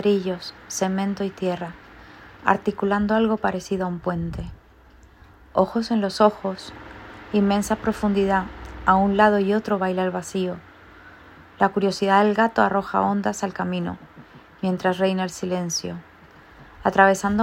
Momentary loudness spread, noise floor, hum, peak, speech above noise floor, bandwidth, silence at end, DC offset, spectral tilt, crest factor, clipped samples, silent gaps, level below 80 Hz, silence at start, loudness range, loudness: 14 LU; -50 dBFS; none; 0 dBFS; 29 dB; 16 kHz; 0 s; under 0.1%; -5.5 dB/octave; 22 dB; under 0.1%; none; -48 dBFS; 0 s; 4 LU; -22 LUFS